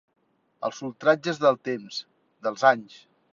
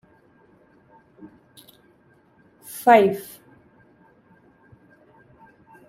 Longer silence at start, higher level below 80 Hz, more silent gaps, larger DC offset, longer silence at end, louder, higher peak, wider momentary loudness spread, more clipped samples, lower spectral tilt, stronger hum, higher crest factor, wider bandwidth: second, 0.6 s vs 2.7 s; second, -76 dBFS vs -70 dBFS; neither; neither; second, 0.5 s vs 2.65 s; second, -25 LUFS vs -18 LUFS; second, -6 dBFS vs -2 dBFS; second, 12 LU vs 27 LU; neither; about the same, -4.5 dB/octave vs -5 dB/octave; neither; about the same, 22 dB vs 24 dB; second, 7.6 kHz vs 16 kHz